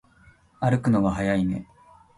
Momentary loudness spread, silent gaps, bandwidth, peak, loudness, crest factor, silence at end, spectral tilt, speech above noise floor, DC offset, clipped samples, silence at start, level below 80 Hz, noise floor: 7 LU; none; 11.5 kHz; -8 dBFS; -24 LUFS; 16 dB; 0.55 s; -8 dB/octave; 33 dB; under 0.1%; under 0.1%; 0.6 s; -48 dBFS; -56 dBFS